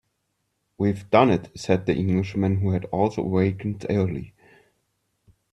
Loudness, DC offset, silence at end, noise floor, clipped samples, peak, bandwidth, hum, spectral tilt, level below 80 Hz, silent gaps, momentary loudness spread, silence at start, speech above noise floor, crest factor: -23 LUFS; under 0.1%; 1.25 s; -75 dBFS; under 0.1%; -2 dBFS; 10.5 kHz; none; -8 dB/octave; -54 dBFS; none; 8 LU; 0.8 s; 52 dB; 22 dB